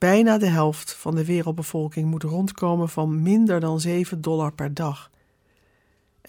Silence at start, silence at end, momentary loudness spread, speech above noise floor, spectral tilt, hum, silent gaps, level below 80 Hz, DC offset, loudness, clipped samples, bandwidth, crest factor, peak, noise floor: 0 s; 1.25 s; 9 LU; 42 dB; -6.5 dB/octave; none; none; -60 dBFS; under 0.1%; -23 LUFS; under 0.1%; 18 kHz; 16 dB; -8 dBFS; -64 dBFS